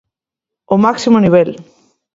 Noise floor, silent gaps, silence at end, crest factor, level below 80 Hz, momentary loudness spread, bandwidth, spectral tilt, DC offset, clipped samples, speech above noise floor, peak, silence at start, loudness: -84 dBFS; none; 0.55 s; 14 dB; -52 dBFS; 7 LU; 7.8 kHz; -7 dB/octave; under 0.1%; under 0.1%; 73 dB; 0 dBFS; 0.7 s; -12 LUFS